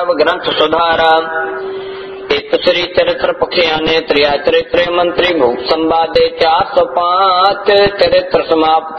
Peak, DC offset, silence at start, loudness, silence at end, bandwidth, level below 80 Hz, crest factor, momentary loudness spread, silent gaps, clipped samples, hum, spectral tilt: 0 dBFS; under 0.1%; 0 s; -12 LUFS; 0 s; 6.4 kHz; -42 dBFS; 12 dB; 7 LU; none; under 0.1%; none; -5 dB/octave